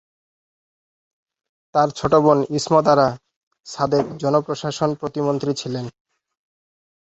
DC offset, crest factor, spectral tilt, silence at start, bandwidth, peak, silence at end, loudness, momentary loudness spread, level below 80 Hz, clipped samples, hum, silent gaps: under 0.1%; 20 dB; -6 dB/octave; 1.75 s; 8.2 kHz; 0 dBFS; 1.3 s; -20 LUFS; 13 LU; -54 dBFS; under 0.1%; none; 3.36-3.51 s